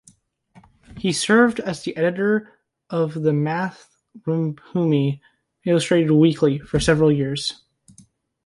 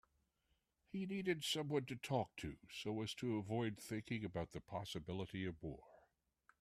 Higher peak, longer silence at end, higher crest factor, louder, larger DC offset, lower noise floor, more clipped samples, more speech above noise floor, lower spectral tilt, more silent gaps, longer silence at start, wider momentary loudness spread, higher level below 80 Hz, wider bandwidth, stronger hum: first, -4 dBFS vs -26 dBFS; first, 0.9 s vs 0.6 s; about the same, 18 dB vs 20 dB; first, -20 LUFS vs -45 LUFS; neither; second, -56 dBFS vs -84 dBFS; neither; about the same, 37 dB vs 40 dB; about the same, -6 dB/octave vs -5 dB/octave; neither; about the same, 0.9 s vs 0.95 s; about the same, 11 LU vs 9 LU; first, -48 dBFS vs -70 dBFS; second, 11.5 kHz vs 15 kHz; neither